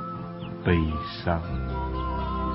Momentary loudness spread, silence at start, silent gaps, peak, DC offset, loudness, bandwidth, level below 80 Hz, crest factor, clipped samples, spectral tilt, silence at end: 10 LU; 0 s; none; -8 dBFS; under 0.1%; -29 LUFS; 5.8 kHz; -34 dBFS; 20 dB; under 0.1%; -11 dB/octave; 0 s